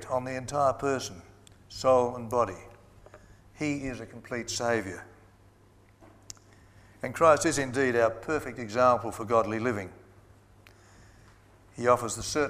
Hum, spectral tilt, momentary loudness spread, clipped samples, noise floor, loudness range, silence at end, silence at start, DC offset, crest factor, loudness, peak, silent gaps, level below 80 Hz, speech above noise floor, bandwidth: 50 Hz at -50 dBFS; -4.5 dB/octave; 20 LU; under 0.1%; -59 dBFS; 9 LU; 0 s; 0 s; under 0.1%; 22 dB; -28 LUFS; -8 dBFS; none; -58 dBFS; 31 dB; 15.5 kHz